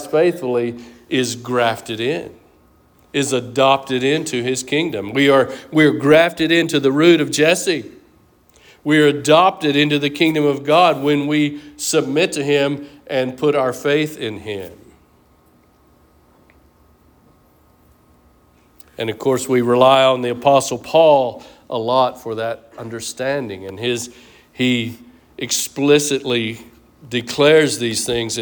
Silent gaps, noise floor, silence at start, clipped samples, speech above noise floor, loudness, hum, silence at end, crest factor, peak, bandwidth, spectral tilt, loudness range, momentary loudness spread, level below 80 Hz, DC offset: none; -53 dBFS; 0 s; under 0.1%; 37 dB; -17 LUFS; none; 0 s; 16 dB; -2 dBFS; over 20 kHz; -4 dB/octave; 8 LU; 13 LU; -56 dBFS; under 0.1%